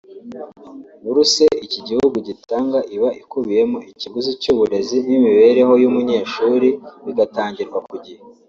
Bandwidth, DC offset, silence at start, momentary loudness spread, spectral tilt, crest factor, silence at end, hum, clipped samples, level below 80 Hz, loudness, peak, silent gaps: 7.8 kHz; under 0.1%; 0.1 s; 17 LU; -4 dB/octave; 16 dB; 0.35 s; none; under 0.1%; -58 dBFS; -17 LUFS; -2 dBFS; none